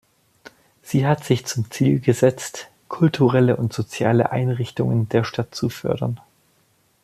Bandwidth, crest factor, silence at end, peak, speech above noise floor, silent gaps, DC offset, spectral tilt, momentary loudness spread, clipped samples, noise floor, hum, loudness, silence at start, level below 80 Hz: 14.5 kHz; 18 dB; 0.9 s; -4 dBFS; 42 dB; none; under 0.1%; -6.5 dB/octave; 10 LU; under 0.1%; -62 dBFS; none; -21 LUFS; 0.85 s; -56 dBFS